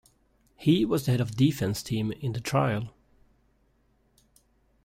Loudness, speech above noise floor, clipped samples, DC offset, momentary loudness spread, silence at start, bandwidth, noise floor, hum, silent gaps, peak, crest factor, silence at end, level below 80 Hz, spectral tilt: -27 LUFS; 41 dB; under 0.1%; under 0.1%; 8 LU; 0.6 s; 16 kHz; -67 dBFS; none; none; -10 dBFS; 18 dB; 1.95 s; -56 dBFS; -6.5 dB/octave